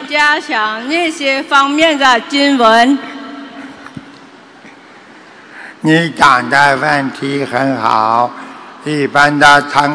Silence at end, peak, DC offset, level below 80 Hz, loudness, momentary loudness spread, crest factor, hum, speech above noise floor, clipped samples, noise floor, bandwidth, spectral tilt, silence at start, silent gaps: 0 s; 0 dBFS; under 0.1%; -50 dBFS; -11 LUFS; 22 LU; 12 dB; none; 27 dB; 1%; -38 dBFS; 11 kHz; -4 dB/octave; 0 s; none